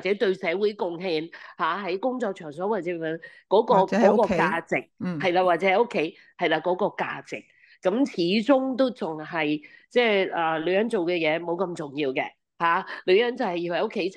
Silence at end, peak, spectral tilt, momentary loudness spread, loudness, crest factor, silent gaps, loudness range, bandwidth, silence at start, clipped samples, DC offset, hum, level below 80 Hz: 0 s; -6 dBFS; -6 dB/octave; 10 LU; -25 LUFS; 18 dB; none; 3 LU; 10 kHz; 0 s; under 0.1%; under 0.1%; none; -66 dBFS